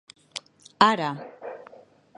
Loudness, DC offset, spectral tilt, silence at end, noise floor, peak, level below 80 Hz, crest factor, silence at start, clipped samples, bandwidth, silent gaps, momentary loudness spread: -22 LUFS; under 0.1%; -4 dB/octave; 0.6 s; -51 dBFS; -2 dBFS; -68 dBFS; 26 dB; 0.35 s; under 0.1%; 11 kHz; none; 20 LU